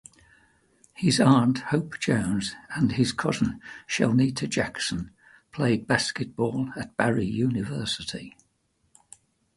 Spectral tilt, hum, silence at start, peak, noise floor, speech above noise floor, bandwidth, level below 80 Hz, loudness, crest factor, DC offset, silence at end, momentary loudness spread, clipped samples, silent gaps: -5 dB/octave; none; 1 s; -6 dBFS; -71 dBFS; 45 dB; 11.5 kHz; -54 dBFS; -26 LUFS; 20 dB; under 0.1%; 1.3 s; 11 LU; under 0.1%; none